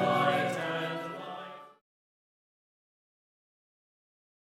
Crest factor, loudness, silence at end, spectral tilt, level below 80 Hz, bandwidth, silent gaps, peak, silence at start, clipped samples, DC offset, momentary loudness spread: 22 dB; -31 LUFS; 2.75 s; -5.5 dB/octave; -84 dBFS; 16.5 kHz; none; -14 dBFS; 0 s; under 0.1%; under 0.1%; 18 LU